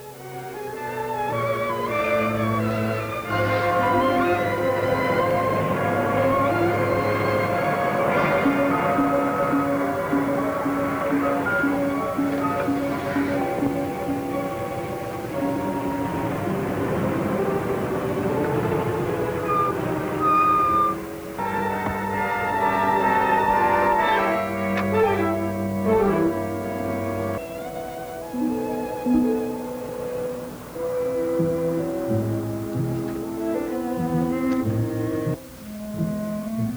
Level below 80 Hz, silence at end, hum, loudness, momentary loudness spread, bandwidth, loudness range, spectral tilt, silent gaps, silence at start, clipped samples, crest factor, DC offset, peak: -48 dBFS; 0 s; none; -23 LUFS; 9 LU; over 20 kHz; 5 LU; -7 dB/octave; none; 0 s; under 0.1%; 12 dB; under 0.1%; -10 dBFS